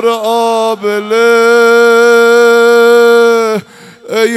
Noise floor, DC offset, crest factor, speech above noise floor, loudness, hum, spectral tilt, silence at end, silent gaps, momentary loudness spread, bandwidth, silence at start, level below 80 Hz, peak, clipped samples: -32 dBFS; under 0.1%; 8 dB; 25 dB; -7 LUFS; none; -3 dB/octave; 0 s; none; 8 LU; 15.5 kHz; 0 s; -68 dBFS; 0 dBFS; 0.2%